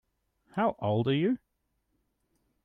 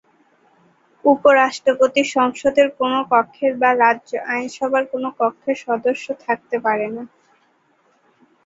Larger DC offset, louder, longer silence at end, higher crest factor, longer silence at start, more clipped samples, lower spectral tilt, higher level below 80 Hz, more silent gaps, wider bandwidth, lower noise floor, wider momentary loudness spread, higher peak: neither; second, -30 LUFS vs -18 LUFS; about the same, 1.3 s vs 1.4 s; about the same, 16 dB vs 18 dB; second, 0.55 s vs 1.05 s; neither; first, -9.5 dB/octave vs -3.5 dB/octave; about the same, -68 dBFS vs -64 dBFS; neither; second, 4.7 kHz vs 8 kHz; first, -78 dBFS vs -60 dBFS; about the same, 8 LU vs 9 LU; second, -16 dBFS vs -2 dBFS